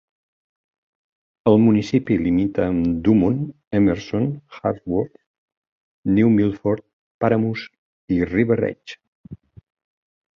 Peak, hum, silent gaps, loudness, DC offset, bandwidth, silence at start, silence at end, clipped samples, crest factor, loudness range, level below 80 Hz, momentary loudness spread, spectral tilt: -2 dBFS; none; 3.67-3.71 s, 5.26-5.48 s, 5.57-6.03 s, 6.93-7.21 s, 7.78-8.08 s, 9.08-9.24 s; -20 LUFS; under 0.1%; 7 kHz; 1.45 s; 1 s; under 0.1%; 18 dB; 4 LU; -46 dBFS; 10 LU; -8.5 dB/octave